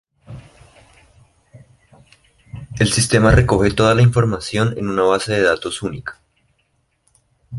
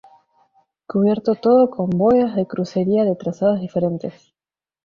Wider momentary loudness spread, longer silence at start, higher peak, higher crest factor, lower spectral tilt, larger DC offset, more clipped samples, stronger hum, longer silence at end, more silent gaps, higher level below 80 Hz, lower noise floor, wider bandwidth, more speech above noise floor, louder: first, 21 LU vs 8 LU; second, 0.3 s vs 0.9 s; first, 0 dBFS vs -4 dBFS; about the same, 18 dB vs 14 dB; second, -5.5 dB/octave vs -9 dB/octave; neither; neither; neither; second, 0 s vs 0.75 s; neither; first, -34 dBFS vs -58 dBFS; second, -65 dBFS vs under -90 dBFS; first, 11.5 kHz vs 7 kHz; second, 50 dB vs over 72 dB; first, -16 LUFS vs -19 LUFS